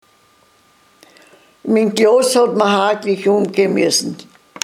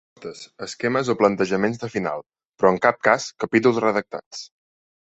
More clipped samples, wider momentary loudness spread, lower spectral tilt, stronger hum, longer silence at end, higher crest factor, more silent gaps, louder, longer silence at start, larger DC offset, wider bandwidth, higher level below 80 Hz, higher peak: neither; second, 8 LU vs 19 LU; about the same, -4 dB/octave vs -5 dB/octave; neither; second, 0.4 s vs 0.6 s; second, 16 dB vs 22 dB; second, none vs 2.45-2.50 s, 4.26-4.31 s; first, -14 LUFS vs -21 LUFS; first, 1.65 s vs 0.2 s; neither; first, 16 kHz vs 8.2 kHz; second, -72 dBFS vs -60 dBFS; about the same, 0 dBFS vs -2 dBFS